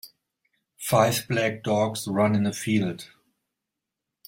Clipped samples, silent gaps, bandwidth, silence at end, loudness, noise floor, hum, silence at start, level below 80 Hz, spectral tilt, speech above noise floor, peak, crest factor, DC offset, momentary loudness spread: under 0.1%; none; 16.5 kHz; 1.2 s; -24 LUFS; -85 dBFS; none; 0.05 s; -64 dBFS; -5 dB/octave; 62 dB; -6 dBFS; 22 dB; under 0.1%; 8 LU